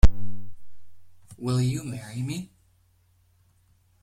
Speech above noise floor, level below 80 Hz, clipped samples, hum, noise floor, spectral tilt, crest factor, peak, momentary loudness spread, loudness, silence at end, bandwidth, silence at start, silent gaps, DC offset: 35 dB; -30 dBFS; under 0.1%; none; -63 dBFS; -6.5 dB/octave; 20 dB; -2 dBFS; 22 LU; -30 LUFS; 1.55 s; 16.5 kHz; 0.05 s; none; under 0.1%